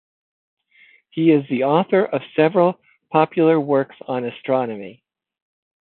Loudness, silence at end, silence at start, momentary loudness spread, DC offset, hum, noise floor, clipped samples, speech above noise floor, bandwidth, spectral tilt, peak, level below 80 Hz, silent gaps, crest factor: -19 LUFS; 0.9 s; 1.15 s; 12 LU; under 0.1%; none; -54 dBFS; under 0.1%; 36 dB; 4.3 kHz; -12 dB/octave; -2 dBFS; -70 dBFS; none; 18 dB